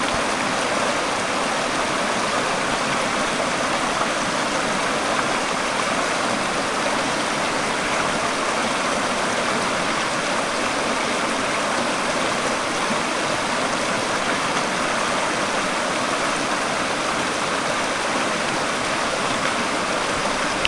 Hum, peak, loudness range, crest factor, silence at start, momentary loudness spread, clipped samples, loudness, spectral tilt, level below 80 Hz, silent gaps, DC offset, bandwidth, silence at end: none; 0 dBFS; 0 LU; 22 dB; 0 s; 1 LU; under 0.1%; -21 LUFS; -2.5 dB/octave; -50 dBFS; none; under 0.1%; 11.5 kHz; 0 s